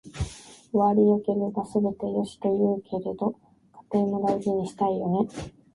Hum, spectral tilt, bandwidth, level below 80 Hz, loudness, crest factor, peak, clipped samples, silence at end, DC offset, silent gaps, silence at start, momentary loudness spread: none; -8 dB/octave; 11.5 kHz; -50 dBFS; -26 LUFS; 16 dB; -10 dBFS; under 0.1%; 0.25 s; under 0.1%; none; 0.05 s; 13 LU